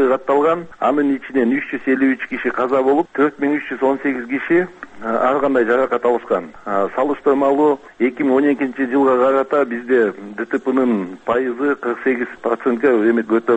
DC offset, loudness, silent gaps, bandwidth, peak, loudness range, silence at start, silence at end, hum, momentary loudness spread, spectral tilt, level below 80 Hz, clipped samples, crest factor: under 0.1%; -18 LUFS; none; 8 kHz; -4 dBFS; 2 LU; 0 s; 0 s; none; 6 LU; -7.5 dB/octave; -58 dBFS; under 0.1%; 14 dB